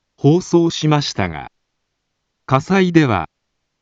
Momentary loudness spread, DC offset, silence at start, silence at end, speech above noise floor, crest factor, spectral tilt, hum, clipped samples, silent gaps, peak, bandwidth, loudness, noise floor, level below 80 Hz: 10 LU; under 0.1%; 0.25 s; 0.55 s; 58 dB; 18 dB; -6 dB/octave; none; under 0.1%; none; 0 dBFS; 7.8 kHz; -16 LUFS; -73 dBFS; -48 dBFS